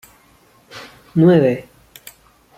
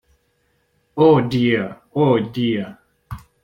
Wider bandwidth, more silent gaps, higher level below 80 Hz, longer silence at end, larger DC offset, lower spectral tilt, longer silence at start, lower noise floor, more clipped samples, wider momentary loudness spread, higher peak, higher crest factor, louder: about the same, 15.5 kHz vs 16.5 kHz; neither; second, -58 dBFS vs -52 dBFS; first, 0.95 s vs 0.25 s; neither; about the same, -8.5 dB/octave vs -8 dB/octave; second, 0.75 s vs 0.95 s; second, -52 dBFS vs -65 dBFS; neither; first, 25 LU vs 22 LU; about the same, -2 dBFS vs -2 dBFS; about the same, 18 dB vs 18 dB; first, -15 LUFS vs -18 LUFS